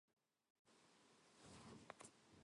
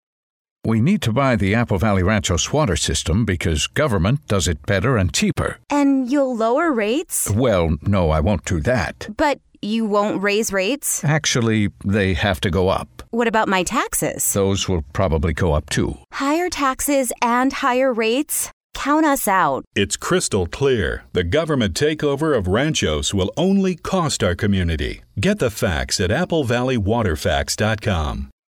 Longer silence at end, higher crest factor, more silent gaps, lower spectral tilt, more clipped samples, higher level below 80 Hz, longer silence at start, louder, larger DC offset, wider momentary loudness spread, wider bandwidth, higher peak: second, 0 s vs 0.25 s; first, 30 dB vs 16 dB; about the same, 0.13-0.17 s, 0.50-0.65 s vs 18.53-18.70 s, 19.67-19.71 s; about the same, -3.5 dB/octave vs -4.5 dB/octave; neither; second, -86 dBFS vs -34 dBFS; second, 0.1 s vs 0.65 s; second, -63 LUFS vs -19 LUFS; neither; about the same, 4 LU vs 4 LU; second, 11 kHz vs over 20 kHz; second, -36 dBFS vs -2 dBFS